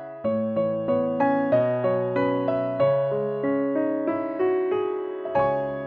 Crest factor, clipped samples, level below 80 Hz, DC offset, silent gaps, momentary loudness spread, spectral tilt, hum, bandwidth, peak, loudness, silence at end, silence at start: 14 dB; under 0.1%; -62 dBFS; under 0.1%; none; 5 LU; -10 dB/octave; none; 4.5 kHz; -10 dBFS; -24 LUFS; 0 s; 0 s